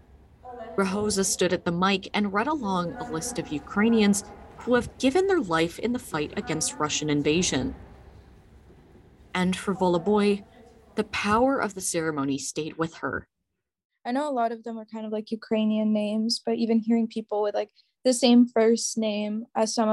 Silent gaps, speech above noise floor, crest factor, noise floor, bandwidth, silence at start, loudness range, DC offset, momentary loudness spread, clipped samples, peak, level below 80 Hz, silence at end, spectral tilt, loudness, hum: 13.85-13.90 s; 57 dB; 20 dB; -82 dBFS; 12.5 kHz; 0.45 s; 5 LU; under 0.1%; 11 LU; under 0.1%; -6 dBFS; -54 dBFS; 0 s; -4.5 dB/octave; -26 LUFS; none